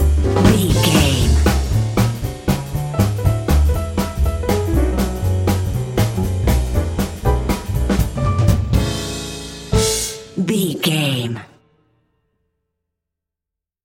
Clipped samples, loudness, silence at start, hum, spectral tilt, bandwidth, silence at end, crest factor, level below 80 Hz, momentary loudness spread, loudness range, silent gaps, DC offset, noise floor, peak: under 0.1%; -18 LUFS; 0 s; none; -5.5 dB/octave; 17 kHz; 2.4 s; 18 dB; -22 dBFS; 8 LU; 4 LU; none; under 0.1%; -85 dBFS; 0 dBFS